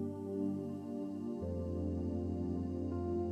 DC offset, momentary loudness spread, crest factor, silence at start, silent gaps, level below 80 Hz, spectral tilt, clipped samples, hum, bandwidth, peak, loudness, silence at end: under 0.1%; 4 LU; 12 dB; 0 s; none; -54 dBFS; -10 dB/octave; under 0.1%; none; 8.8 kHz; -26 dBFS; -39 LUFS; 0 s